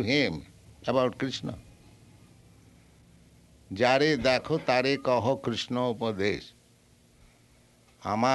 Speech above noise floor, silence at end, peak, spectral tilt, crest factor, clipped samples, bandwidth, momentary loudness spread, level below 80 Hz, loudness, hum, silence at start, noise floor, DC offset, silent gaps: 34 dB; 0 s; -8 dBFS; -5 dB/octave; 22 dB; under 0.1%; 12 kHz; 16 LU; -58 dBFS; -27 LUFS; none; 0 s; -60 dBFS; under 0.1%; none